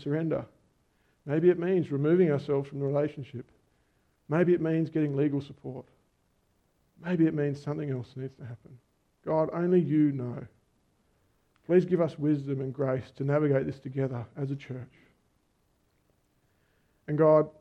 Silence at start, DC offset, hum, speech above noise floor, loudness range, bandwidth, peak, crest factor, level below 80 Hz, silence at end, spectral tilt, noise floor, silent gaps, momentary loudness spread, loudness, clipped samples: 0 s; under 0.1%; none; 43 dB; 5 LU; 6.4 kHz; -10 dBFS; 20 dB; -68 dBFS; 0.1 s; -10 dB/octave; -71 dBFS; none; 18 LU; -28 LUFS; under 0.1%